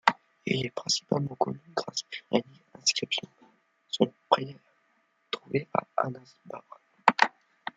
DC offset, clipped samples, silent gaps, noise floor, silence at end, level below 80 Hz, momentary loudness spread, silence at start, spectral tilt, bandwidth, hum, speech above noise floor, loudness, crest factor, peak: under 0.1%; under 0.1%; none; -71 dBFS; 0.5 s; -74 dBFS; 15 LU; 0.05 s; -3.5 dB/octave; 11 kHz; none; 39 dB; -29 LUFS; 30 dB; -2 dBFS